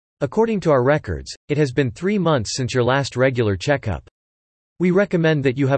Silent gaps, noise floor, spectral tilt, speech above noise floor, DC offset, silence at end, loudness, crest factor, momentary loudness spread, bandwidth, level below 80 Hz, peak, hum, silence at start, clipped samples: 1.37-1.48 s, 4.11-4.76 s; under -90 dBFS; -6 dB/octave; over 71 dB; under 0.1%; 0 s; -19 LUFS; 16 dB; 7 LU; 8.8 kHz; -46 dBFS; -4 dBFS; none; 0.2 s; under 0.1%